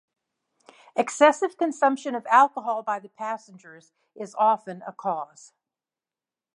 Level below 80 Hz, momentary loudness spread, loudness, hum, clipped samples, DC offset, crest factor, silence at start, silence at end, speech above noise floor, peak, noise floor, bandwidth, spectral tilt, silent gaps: -88 dBFS; 17 LU; -24 LUFS; none; under 0.1%; under 0.1%; 22 dB; 0.95 s; 1.3 s; over 66 dB; -4 dBFS; under -90 dBFS; 11 kHz; -3.5 dB/octave; none